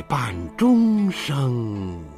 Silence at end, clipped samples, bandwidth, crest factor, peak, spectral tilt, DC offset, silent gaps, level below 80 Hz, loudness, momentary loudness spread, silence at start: 0 s; under 0.1%; 14.5 kHz; 14 dB; -8 dBFS; -7 dB/octave; under 0.1%; none; -48 dBFS; -21 LUFS; 11 LU; 0 s